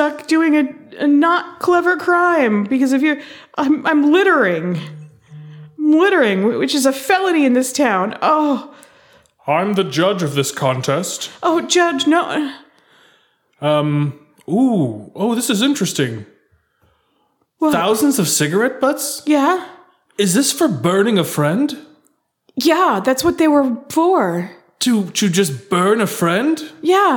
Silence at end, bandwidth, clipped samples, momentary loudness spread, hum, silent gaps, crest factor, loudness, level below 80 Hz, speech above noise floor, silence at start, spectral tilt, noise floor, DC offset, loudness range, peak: 0 s; 19 kHz; under 0.1%; 9 LU; none; none; 14 dB; -16 LUFS; -62 dBFS; 48 dB; 0 s; -4.5 dB/octave; -63 dBFS; under 0.1%; 4 LU; -2 dBFS